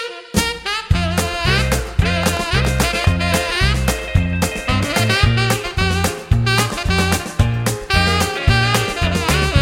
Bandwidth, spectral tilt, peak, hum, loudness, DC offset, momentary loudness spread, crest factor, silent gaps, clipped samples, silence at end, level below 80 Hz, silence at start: 16.5 kHz; -4.5 dB/octave; 0 dBFS; none; -17 LUFS; under 0.1%; 4 LU; 16 dB; none; under 0.1%; 0 s; -24 dBFS; 0 s